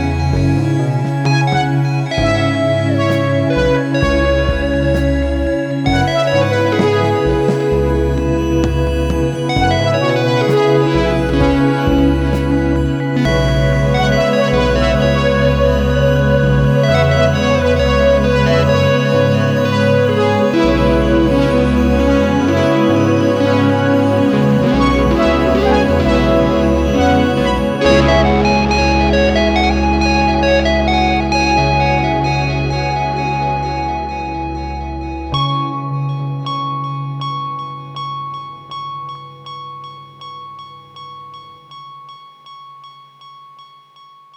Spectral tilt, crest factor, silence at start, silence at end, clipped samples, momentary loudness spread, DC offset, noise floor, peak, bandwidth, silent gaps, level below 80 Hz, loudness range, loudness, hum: -6.5 dB/octave; 12 dB; 0 s; 0.75 s; under 0.1%; 11 LU; under 0.1%; -43 dBFS; -2 dBFS; 12.5 kHz; none; -24 dBFS; 10 LU; -14 LUFS; 50 Hz at -45 dBFS